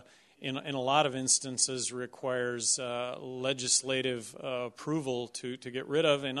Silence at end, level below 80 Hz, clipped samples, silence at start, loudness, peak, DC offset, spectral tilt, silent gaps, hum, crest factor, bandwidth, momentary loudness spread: 0 s; -74 dBFS; under 0.1%; 0.4 s; -31 LUFS; -12 dBFS; under 0.1%; -2.5 dB/octave; none; none; 20 dB; 12 kHz; 11 LU